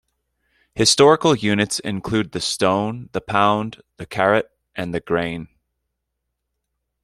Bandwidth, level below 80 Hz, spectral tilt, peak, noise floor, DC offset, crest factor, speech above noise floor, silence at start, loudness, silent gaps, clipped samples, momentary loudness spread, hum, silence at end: 15 kHz; -54 dBFS; -4 dB/octave; -2 dBFS; -78 dBFS; under 0.1%; 20 dB; 59 dB; 0.75 s; -19 LUFS; none; under 0.1%; 17 LU; none; 1.6 s